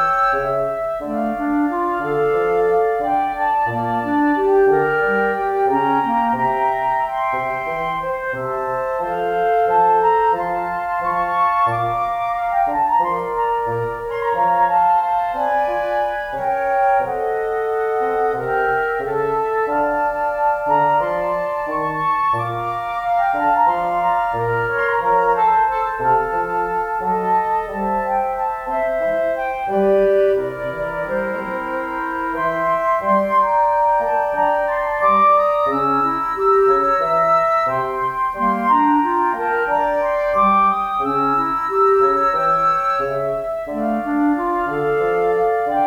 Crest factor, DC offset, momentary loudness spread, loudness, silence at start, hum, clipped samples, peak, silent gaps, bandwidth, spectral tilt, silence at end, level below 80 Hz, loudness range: 12 dB; under 0.1%; 7 LU; -18 LUFS; 0 s; none; under 0.1%; -6 dBFS; none; 18.5 kHz; -7 dB/octave; 0 s; -46 dBFS; 3 LU